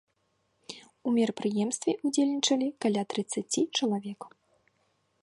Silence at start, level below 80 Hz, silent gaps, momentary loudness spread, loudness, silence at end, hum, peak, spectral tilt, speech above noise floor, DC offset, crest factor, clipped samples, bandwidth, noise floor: 0.7 s; -78 dBFS; none; 19 LU; -29 LUFS; 0.95 s; none; -12 dBFS; -4 dB/octave; 46 dB; under 0.1%; 18 dB; under 0.1%; 11.5 kHz; -74 dBFS